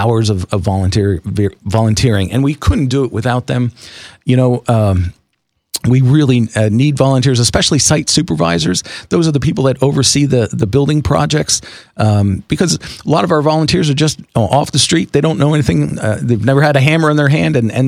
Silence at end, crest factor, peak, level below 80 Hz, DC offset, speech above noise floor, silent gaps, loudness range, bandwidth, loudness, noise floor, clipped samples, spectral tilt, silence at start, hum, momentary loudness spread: 0 s; 12 dB; 0 dBFS; -32 dBFS; under 0.1%; 54 dB; none; 3 LU; 15 kHz; -13 LUFS; -66 dBFS; 0.1%; -5 dB/octave; 0 s; none; 6 LU